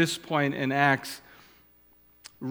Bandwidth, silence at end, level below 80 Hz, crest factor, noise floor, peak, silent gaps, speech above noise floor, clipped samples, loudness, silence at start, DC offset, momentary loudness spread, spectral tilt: 19 kHz; 0 s; -70 dBFS; 22 dB; -60 dBFS; -6 dBFS; none; 34 dB; under 0.1%; -26 LUFS; 0 s; under 0.1%; 16 LU; -4.5 dB/octave